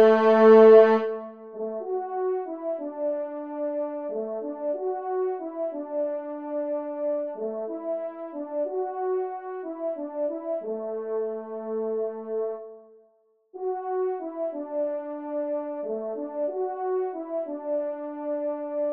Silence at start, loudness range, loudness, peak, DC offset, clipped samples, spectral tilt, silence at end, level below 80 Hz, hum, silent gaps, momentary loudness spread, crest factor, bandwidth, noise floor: 0 s; 5 LU; -26 LUFS; -4 dBFS; under 0.1%; under 0.1%; -8 dB/octave; 0 s; -82 dBFS; none; none; 8 LU; 22 dB; 5.2 kHz; -64 dBFS